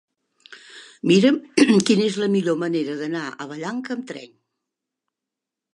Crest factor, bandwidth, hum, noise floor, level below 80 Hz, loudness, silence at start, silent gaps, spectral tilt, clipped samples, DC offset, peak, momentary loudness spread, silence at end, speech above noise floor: 20 dB; 11.5 kHz; none; -86 dBFS; -74 dBFS; -21 LUFS; 0.5 s; none; -5 dB/octave; under 0.1%; under 0.1%; -2 dBFS; 17 LU; 1.5 s; 66 dB